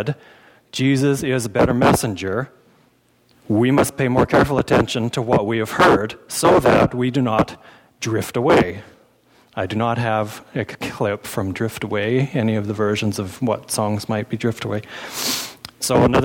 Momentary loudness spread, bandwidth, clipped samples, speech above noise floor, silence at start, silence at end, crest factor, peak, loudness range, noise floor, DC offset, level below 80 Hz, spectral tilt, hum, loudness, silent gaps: 11 LU; 19 kHz; under 0.1%; 39 dB; 0 s; 0 s; 14 dB; -6 dBFS; 6 LU; -58 dBFS; under 0.1%; -44 dBFS; -5.5 dB/octave; none; -19 LUFS; none